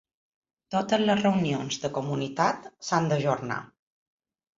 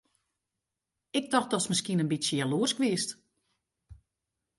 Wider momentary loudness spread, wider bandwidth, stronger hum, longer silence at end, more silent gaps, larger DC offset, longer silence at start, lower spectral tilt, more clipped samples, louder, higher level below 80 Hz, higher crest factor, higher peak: about the same, 8 LU vs 7 LU; second, 7.8 kHz vs 11.5 kHz; neither; first, 0.95 s vs 0.65 s; neither; neither; second, 0.7 s vs 1.15 s; first, -5.5 dB/octave vs -4 dB/octave; neither; about the same, -27 LUFS vs -29 LUFS; about the same, -64 dBFS vs -68 dBFS; about the same, 20 dB vs 22 dB; first, -8 dBFS vs -12 dBFS